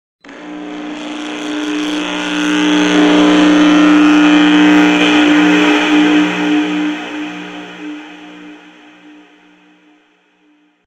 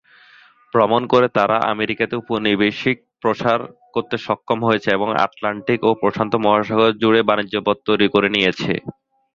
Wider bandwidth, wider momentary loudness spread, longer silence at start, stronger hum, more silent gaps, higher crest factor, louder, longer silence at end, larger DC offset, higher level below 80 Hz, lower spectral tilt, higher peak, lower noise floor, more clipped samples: first, 9 kHz vs 7.4 kHz; first, 20 LU vs 8 LU; second, 0.25 s vs 0.75 s; first, 60 Hz at -30 dBFS vs none; neither; second, 12 dB vs 18 dB; first, -11 LUFS vs -18 LUFS; first, 2.3 s vs 0.45 s; neither; about the same, -52 dBFS vs -56 dBFS; second, -4.5 dB/octave vs -6.5 dB/octave; about the same, 0 dBFS vs 0 dBFS; about the same, -53 dBFS vs -50 dBFS; neither